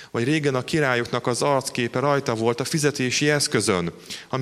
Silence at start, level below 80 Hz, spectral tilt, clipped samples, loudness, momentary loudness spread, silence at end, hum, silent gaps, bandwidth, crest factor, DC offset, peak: 0 s; -58 dBFS; -4 dB/octave; under 0.1%; -22 LUFS; 5 LU; 0 s; none; none; 15 kHz; 18 dB; under 0.1%; -6 dBFS